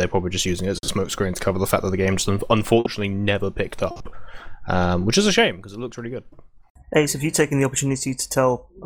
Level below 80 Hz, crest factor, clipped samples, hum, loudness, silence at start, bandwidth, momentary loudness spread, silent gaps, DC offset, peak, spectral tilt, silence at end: -42 dBFS; 18 dB; under 0.1%; none; -21 LUFS; 0 s; over 20 kHz; 14 LU; 6.70-6.75 s; under 0.1%; -4 dBFS; -4.5 dB/octave; 0 s